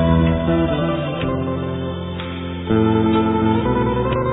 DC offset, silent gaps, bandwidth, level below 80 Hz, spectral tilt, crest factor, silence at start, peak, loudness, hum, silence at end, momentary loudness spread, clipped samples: under 0.1%; none; 4 kHz; -32 dBFS; -11.5 dB/octave; 14 dB; 0 s; -4 dBFS; -19 LUFS; none; 0 s; 10 LU; under 0.1%